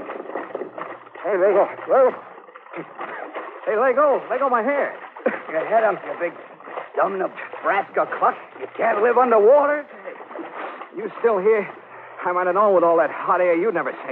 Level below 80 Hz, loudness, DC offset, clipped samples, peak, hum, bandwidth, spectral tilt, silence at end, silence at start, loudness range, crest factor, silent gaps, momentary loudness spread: -80 dBFS; -20 LUFS; under 0.1%; under 0.1%; -6 dBFS; none; 4.1 kHz; -8.5 dB/octave; 0 s; 0 s; 4 LU; 16 dB; none; 18 LU